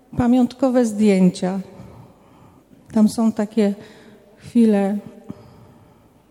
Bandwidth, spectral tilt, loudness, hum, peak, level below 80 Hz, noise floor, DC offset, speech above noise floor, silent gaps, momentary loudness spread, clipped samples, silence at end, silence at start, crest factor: 12.5 kHz; -7.5 dB/octave; -19 LUFS; none; -4 dBFS; -52 dBFS; -51 dBFS; under 0.1%; 34 dB; none; 23 LU; under 0.1%; 1 s; 0.15 s; 16 dB